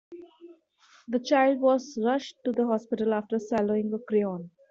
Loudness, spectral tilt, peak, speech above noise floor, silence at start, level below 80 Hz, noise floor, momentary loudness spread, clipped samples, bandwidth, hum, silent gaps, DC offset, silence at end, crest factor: -27 LUFS; -6 dB/octave; -10 dBFS; 34 dB; 0.1 s; -72 dBFS; -60 dBFS; 9 LU; under 0.1%; 7.6 kHz; none; none; under 0.1%; 0.2 s; 16 dB